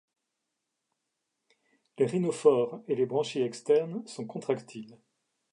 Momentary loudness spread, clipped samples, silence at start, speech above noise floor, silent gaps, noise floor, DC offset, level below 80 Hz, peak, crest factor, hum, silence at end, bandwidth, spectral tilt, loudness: 14 LU; under 0.1%; 2 s; 55 dB; none; -84 dBFS; under 0.1%; -84 dBFS; -10 dBFS; 22 dB; none; 0.6 s; 11 kHz; -6 dB/octave; -29 LUFS